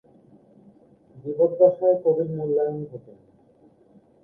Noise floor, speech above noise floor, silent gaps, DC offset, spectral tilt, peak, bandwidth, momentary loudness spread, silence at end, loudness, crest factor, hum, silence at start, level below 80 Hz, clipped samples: -56 dBFS; 35 dB; none; under 0.1%; -12.5 dB/octave; -4 dBFS; 1.8 kHz; 20 LU; 1.25 s; -22 LUFS; 20 dB; none; 1.15 s; -68 dBFS; under 0.1%